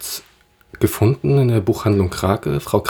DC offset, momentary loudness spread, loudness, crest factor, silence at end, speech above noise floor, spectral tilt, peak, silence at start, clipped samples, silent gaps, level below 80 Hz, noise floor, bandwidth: under 0.1%; 6 LU; -18 LUFS; 18 dB; 0 s; 37 dB; -6.5 dB/octave; 0 dBFS; 0 s; under 0.1%; none; -42 dBFS; -53 dBFS; over 20 kHz